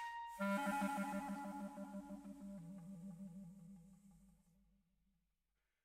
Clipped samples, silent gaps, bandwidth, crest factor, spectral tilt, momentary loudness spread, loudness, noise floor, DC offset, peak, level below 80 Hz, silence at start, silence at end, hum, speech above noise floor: under 0.1%; none; 16 kHz; 20 dB; -6 dB/octave; 19 LU; -46 LUFS; -89 dBFS; under 0.1%; -28 dBFS; -76 dBFS; 0 s; 1.55 s; none; 43 dB